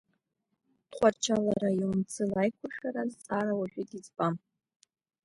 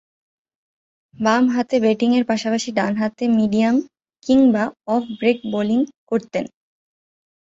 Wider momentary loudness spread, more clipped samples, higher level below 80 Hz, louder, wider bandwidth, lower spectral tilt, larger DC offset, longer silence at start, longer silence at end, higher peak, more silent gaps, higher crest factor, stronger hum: first, 11 LU vs 7 LU; neither; second, -66 dBFS vs -60 dBFS; second, -31 LUFS vs -19 LUFS; first, 11.5 kHz vs 7.8 kHz; about the same, -5.5 dB/octave vs -5.5 dB/octave; neither; second, 0.9 s vs 1.2 s; about the same, 0.9 s vs 0.95 s; second, -12 dBFS vs -2 dBFS; second, none vs 5.98-6.07 s; about the same, 20 dB vs 18 dB; neither